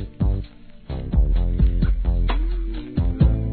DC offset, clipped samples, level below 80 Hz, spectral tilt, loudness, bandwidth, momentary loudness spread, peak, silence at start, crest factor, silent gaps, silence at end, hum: 0.3%; under 0.1%; -22 dBFS; -11.5 dB/octave; -23 LUFS; 4.5 kHz; 10 LU; -6 dBFS; 0 s; 14 dB; none; 0 s; none